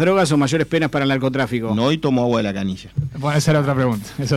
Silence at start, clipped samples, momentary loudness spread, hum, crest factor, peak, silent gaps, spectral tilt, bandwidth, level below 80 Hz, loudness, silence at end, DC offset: 0 s; under 0.1%; 8 LU; none; 10 dB; -8 dBFS; none; -6 dB/octave; 15 kHz; -48 dBFS; -19 LUFS; 0 s; under 0.1%